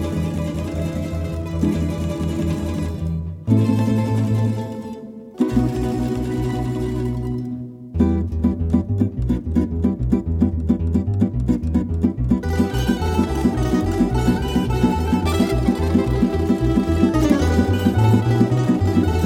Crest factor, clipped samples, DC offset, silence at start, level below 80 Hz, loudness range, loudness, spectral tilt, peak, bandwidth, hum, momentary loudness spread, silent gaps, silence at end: 16 dB; under 0.1%; under 0.1%; 0 s; -28 dBFS; 5 LU; -20 LUFS; -8 dB/octave; -2 dBFS; 15.5 kHz; none; 8 LU; none; 0 s